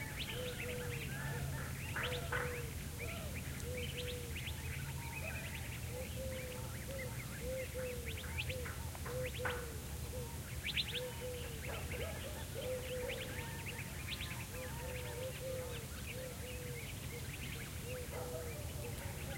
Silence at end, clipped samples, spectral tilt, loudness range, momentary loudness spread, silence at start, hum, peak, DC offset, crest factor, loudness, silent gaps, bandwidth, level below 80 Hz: 0 s; under 0.1%; -4 dB/octave; 3 LU; 5 LU; 0 s; none; -24 dBFS; under 0.1%; 20 dB; -43 LUFS; none; 16.5 kHz; -52 dBFS